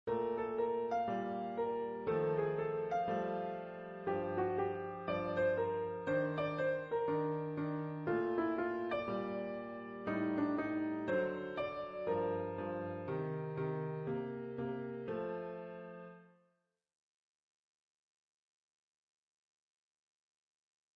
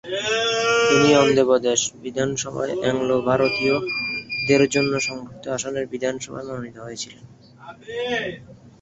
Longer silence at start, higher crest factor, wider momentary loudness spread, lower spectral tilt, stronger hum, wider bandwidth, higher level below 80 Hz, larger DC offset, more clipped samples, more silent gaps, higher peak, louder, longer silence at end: about the same, 0.05 s vs 0.05 s; about the same, 16 dB vs 20 dB; second, 8 LU vs 17 LU; first, -6 dB/octave vs -3.5 dB/octave; neither; second, 6.2 kHz vs 8.2 kHz; second, -72 dBFS vs -56 dBFS; neither; neither; neither; second, -24 dBFS vs -2 dBFS; second, -38 LUFS vs -21 LUFS; first, 4.7 s vs 0.15 s